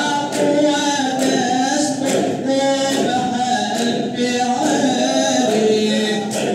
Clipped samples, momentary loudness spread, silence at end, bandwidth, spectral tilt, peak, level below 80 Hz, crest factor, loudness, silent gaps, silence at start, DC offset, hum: under 0.1%; 3 LU; 0 s; 15 kHz; -3.5 dB/octave; -4 dBFS; -68 dBFS; 12 dB; -17 LUFS; none; 0 s; under 0.1%; none